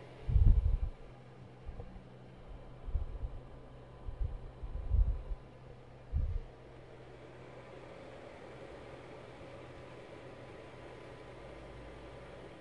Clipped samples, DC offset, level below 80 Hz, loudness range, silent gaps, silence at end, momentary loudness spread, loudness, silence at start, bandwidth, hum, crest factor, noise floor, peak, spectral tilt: under 0.1%; under 0.1%; -38 dBFS; 10 LU; none; 0 s; 19 LU; -41 LUFS; 0 s; 5.6 kHz; none; 24 dB; -54 dBFS; -14 dBFS; -8 dB/octave